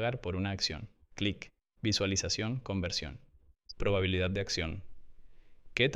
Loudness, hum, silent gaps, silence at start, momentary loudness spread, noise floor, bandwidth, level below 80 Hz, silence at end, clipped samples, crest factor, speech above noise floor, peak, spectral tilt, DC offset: -33 LUFS; none; none; 0 s; 16 LU; -55 dBFS; 11.5 kHz; -50 dBFS; 0 s; under 0.1%; 22 dB; 21 dB; -12 dBFS; -4 dB/octave; under 0.1%